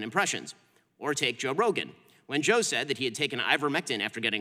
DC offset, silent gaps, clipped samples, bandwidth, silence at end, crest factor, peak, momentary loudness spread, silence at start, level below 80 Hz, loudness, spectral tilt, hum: under 0.1%; none; under 0.1%; 15.5 kHz; 0 s; 22 dB; -8 dBFS; 9 LU; 0 s; -82 dBFS; -28 LUFS; -2.5 dB/octave; none